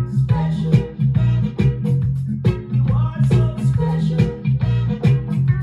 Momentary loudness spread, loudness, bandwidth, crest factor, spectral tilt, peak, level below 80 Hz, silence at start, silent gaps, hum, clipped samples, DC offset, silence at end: 3 LU; -19 LUFS; 7 kHz; 14 dB; -9.5 dB/octave; -2 dBFS; -34 dBFS; 0 s; none; none; under 0.1%; under 0.1%; 0 s